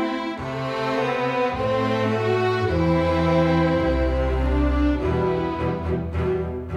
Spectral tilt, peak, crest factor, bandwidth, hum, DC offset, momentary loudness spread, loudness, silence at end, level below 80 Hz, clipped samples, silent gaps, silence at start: -7.5 dB/octave; -8 dBFS; 14 dB; 9.4 kHz; none; under 0.1%; 6 LU; -22 LUFS; 0 s; -30 dBFS; under 0.1%; none; 0 s